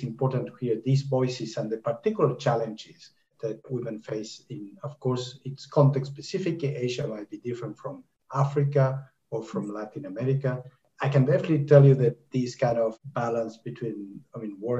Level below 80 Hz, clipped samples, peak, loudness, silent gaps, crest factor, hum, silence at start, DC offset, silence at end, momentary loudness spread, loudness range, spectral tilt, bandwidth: -70 dBFS; under 0.1%; -4 dBFS; -27 LUFS; none; 24 dB; none; 0 s; under 0.1%; 0 s; 16 LU; 7 LU; -8 dB/octave; 7.8 kHz